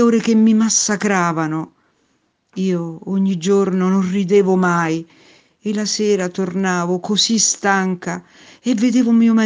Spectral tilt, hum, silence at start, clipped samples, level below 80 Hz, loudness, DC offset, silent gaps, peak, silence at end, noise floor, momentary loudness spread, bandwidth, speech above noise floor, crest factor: -4.5 dB/octave; none; 0 s; under 0.1%; -64 dBFS; -17 LUFS; under 0.1%; none; 0 dBFS; 0 s; -64 dBFS; 12 LU; 10 kHz; 48 dB; 16 dB